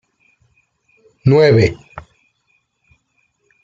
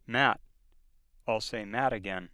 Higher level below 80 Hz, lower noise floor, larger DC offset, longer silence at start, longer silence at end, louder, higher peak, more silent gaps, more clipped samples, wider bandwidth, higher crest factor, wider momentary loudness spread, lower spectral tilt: first, -48 dBFS vs -58 dBFS; about the same, -65 dBFS vs -62 dBFS; neither; first, 1.25 s vs 0.1 s; first, 1.65 s vs 0.05 s; first, -13 LUFS vs -31 LUFS; first, -2 dBFS vs -8 dBFS; neither; neither; second, 7.6 kHz vs 13 kHz; second, 18 dB vs 24 dB; first, 27 LU vs 11 LU; first, -7.5 dB/octave vs -4.5 dB/octave